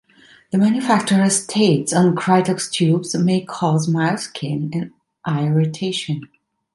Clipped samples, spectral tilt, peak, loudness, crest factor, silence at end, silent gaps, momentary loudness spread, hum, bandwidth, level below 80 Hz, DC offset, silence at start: under 0.1%; -5.5 dB/octave; -2 dBFS; -19 LUFS; 16 dB; 0.5 s; none; 9 LU; none; 11.5 kHz; -62 dBFS; under 0.1%; 0.5 s